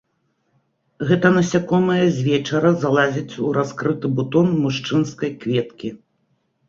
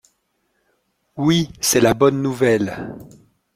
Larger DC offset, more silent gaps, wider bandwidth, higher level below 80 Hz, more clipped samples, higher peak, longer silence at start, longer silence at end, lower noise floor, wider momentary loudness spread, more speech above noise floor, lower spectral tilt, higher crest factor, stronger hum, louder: neither; neither; second, 7.6 kHz vs 16.5 kHz; second, -58 dBFS vs -50 dBFS; neither; about the same, -2 dBFS vs -2 dBFS; second, 1 s vs 1.15 s; first, 0.7 s vs 0.5 s; about the same, -68 dBFS vs -68 dBFS; second, 8 LU vs 18 LU; about the same, 50 dB vs 51 dB; first, -6.5 dB/octave vs -4.5 dB/octave; about the same, 18 dB vs 18 dB; neither; about the same, -19 LUFS vs -17 LUFS